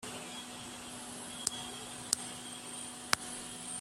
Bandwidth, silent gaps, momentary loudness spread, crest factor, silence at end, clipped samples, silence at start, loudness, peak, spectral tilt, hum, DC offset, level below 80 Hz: 16 kHz; none; 10 LU; 38 dB; 0 s; under 0.1%; 0 s; -39 LUFS; -4 dBFS; -1 dB/octave; none; under 0.1%; -68 dBFS